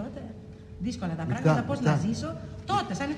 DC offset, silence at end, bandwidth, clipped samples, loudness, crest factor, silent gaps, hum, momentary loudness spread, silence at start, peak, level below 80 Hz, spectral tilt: under 0.1%; 0 s; 10.5 kHz; under 0.1%; -29 LUFS; 20 dB; none; none; 17 LU; 0 s; -10 dBFS; -52 dBFS; -6.5 dB/octave